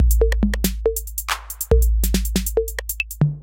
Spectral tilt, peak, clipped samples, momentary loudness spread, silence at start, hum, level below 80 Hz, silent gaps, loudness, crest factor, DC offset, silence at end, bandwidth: -5 dB/octave; -2 dBFS; under 0.1%; 7 LU; 0 s; none; -22 dBFS; none; -21 LUFS; 16 dB; under 0.1%; 0 s; 17.5 kHz